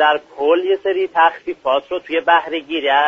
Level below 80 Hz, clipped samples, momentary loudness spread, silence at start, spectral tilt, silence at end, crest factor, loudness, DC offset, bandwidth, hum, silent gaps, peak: -62 dBFS; under 0.1%; 6 LU; 0 s; 1 dB/octave; 0 s; 14 dB; -17 LUFS; under 0.1%; 7 kHz; none; none; -2 dBFS